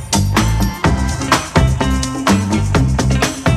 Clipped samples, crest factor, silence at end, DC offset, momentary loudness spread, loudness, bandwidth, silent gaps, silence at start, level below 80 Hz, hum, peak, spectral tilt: under 0.1%; 14 dB; 0 s; under 0.1%; 3 LU; -15 LUFS; 14 kHz; none; 0 s; -22 dBFS; none; -2 dBFS; -5 dB/octave